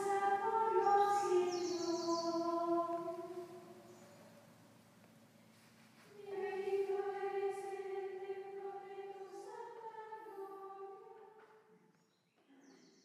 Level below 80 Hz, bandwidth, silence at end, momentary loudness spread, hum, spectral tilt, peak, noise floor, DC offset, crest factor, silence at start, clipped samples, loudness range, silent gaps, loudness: under -90 dBFS; 15 kHz; 0.3 s; 22 LU; none; -4 dB/octave; -22 dBFS; -75 dBFS; under 0.1%; 18 dB; 0 s; under 0.1%; 17 LU; none; -39 LUFS